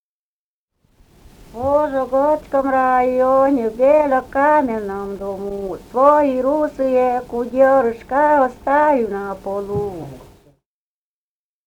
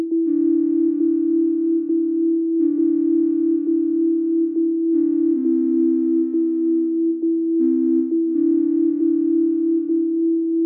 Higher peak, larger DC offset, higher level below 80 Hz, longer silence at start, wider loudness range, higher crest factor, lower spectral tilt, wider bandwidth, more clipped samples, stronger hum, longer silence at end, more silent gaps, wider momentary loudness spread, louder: first, 0 dBFS vs -10 dBFS; neither; first, -48 dBFS vs -86 dBFS; first, 1.55 s vs 0 s; first, 4 LU vs 0 LU; first, 18 dB vs 8 dB; second, -7 dB/octave vs -11.5 dB/octave; first, 14.5 kHz vs 1.2 kHz; neither; neither; first, 1.45 s vs 0 s; neither; first, 12 LU vs 2 LU; about the same, -17 LUFS vs -19 LUFS